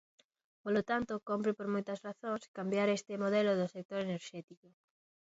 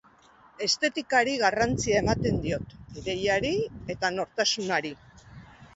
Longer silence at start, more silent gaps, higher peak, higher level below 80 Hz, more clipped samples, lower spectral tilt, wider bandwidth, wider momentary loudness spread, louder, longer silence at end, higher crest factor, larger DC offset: about the same, 0.65 s vs 0.6 s; first, 2.48-2.54 s, 3.85-3.89 s, 4.44-4.48 s vs none; second, -20 dBFS vs -8 dBFS; second, -74 dBFS vs -48 dBFS; neither; about the same, -5 dB/octave vs -4 dB/octave; about the same, 7.6 kHz vs 8.2 kHz; about the same, 11 LU vs 10 LU; second, -36 LUFS vs -26 LUFS; first, 0.7 s vs 0.1 s; about the same, 18 dB vs 20 dB; neither